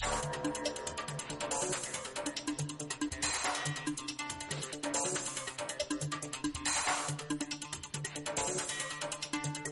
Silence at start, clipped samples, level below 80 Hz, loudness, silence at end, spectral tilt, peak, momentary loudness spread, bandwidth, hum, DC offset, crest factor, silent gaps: 0 s; under 0.1%; -58 dBFS; -36 LUFS; 0 s; -2.5 dB/octave; -18 dBFS; 6 LU; 11.5 kHz; none; under 0.1%; 20 dB; none